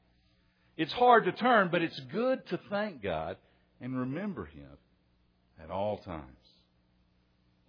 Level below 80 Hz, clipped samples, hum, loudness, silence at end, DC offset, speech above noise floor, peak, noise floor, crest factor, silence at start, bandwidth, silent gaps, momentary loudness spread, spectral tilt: -64 dBFS; under 0.1%; none; -30 LUFS; 1.4 s; under 0.1%; 40 dB; -10 dBFS; -70 dBFS; 24 dB; 0.8 s; 5.4 kHz; none; 21 LU; -3.5 dB/octave